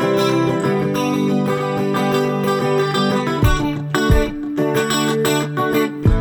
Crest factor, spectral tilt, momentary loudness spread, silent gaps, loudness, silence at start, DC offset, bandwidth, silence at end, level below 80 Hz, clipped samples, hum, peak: 16 dB; -5.5 dB/octave; 3 LU; none; -18 LUFS; 0 s; under 0.1%; over 20 kHz; 0 s; -26 dBFS; under 0.1%; none; -2 dBFS